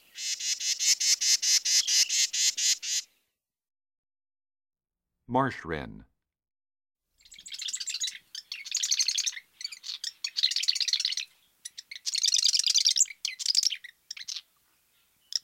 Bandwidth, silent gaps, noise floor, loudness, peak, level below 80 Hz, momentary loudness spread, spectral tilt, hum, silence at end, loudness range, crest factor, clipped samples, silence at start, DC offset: 16 kHz; 3.98-4.03 s; -86 dBFS; -25 LUFS; -10 dBFS; -66 dBFS; 18 LU; 0.5 dB/octave; none; 0.05 s; 13 LU; 20 dB; under 0.1%; 0.15 s; under 0.1%